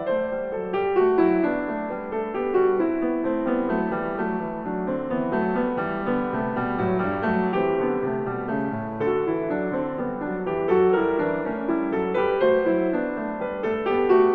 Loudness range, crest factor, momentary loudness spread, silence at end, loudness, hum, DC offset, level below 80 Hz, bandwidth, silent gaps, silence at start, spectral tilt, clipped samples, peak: 3 LU; 14 dB; 8 LU; 0 s; -24 LUFS; none; under 0.1%; -52 dBFS; 4.7 kHz; none; 0 s; -10 dB/octave; under 0.1%; -8 dBFS